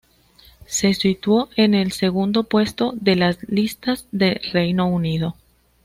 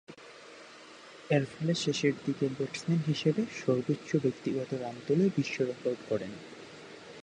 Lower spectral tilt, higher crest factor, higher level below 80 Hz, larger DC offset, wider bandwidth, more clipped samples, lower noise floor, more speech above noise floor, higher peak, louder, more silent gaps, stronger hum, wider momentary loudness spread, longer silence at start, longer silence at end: about the same, -5 dB/octave vs -6 dB/octave; about the same, 16 dB vs 18 dB; first, -50 dBFS vs -72 dBFS; neither; first, 16 kHz vs 10 kHz; neither; about the same, -52 dBFS vs -51 dBFS; first, 33 dB vs 21 dB; first, -4 dBFS vs -14 dBFS; first, -20 LUFS vs -31 LUFS; neither; neither; second, 6 LU vs 21 LU; first, 0.7 s vs 0.1 s; first, 0.5 s vs 0 s